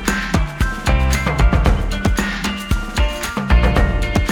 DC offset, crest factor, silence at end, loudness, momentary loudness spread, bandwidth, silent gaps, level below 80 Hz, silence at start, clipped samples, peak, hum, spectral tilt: under 0.1%; 16 dB; 0 s; -18 LUFS; 6 LU; 18 kHz; none; -18 dBFS; 0 s; under 0.1%; 0 dBFS; none; -5 dB/octave